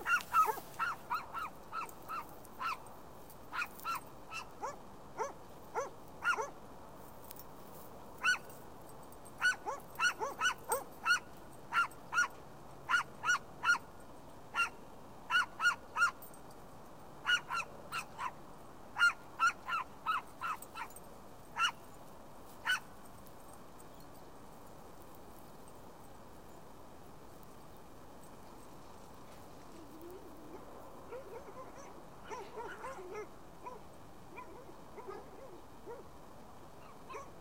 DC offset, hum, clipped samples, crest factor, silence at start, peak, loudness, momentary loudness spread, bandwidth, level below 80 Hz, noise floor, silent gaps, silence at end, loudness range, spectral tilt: 0.2%; none; under 0.1%; 22 dB; 0 s; -18 dBFS; -37 LUFS; 22 LU; 16 kHz; -66 dBFS; -55 dBFS; none; 0 s; 19 LU; -1.5 dB/octave